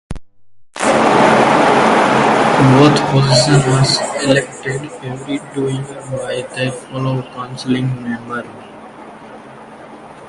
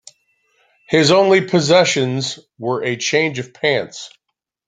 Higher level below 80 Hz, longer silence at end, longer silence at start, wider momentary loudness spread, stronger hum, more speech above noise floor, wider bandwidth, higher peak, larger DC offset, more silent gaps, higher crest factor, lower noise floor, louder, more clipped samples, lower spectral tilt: first, -44 dBFS vs -58 dBFS; second, 0 s vs 0.6 s; second, 0.1 s vs 0.9 s; first, 17 LU vs 14 LU; neither; second, 27 dB vs 61 dB; first, 11.5 kHz vs 9.6 kHz; about the same, 0 dBFS vs 0 dBFS; neither; neither; about the same, 14 dB vs 18 dB; second, -43 dBFS vs -78 dBFS; about the same, -14 LUFS vs -16 LUFS; neither; about the same, -5 dB/octave vs -4 dB/octave